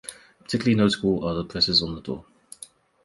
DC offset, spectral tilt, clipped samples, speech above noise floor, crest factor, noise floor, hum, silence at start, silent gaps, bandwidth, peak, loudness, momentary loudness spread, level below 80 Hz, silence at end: under 0.1%; -5 dB/octave; under 0.1%; 25 dB; 18 dB; -48 dBFS; none; 0.05 s; none; 11.5 kHz; -6 dBFS; -23 LUFS; 23 LU; -50 dBFS; 0.85 s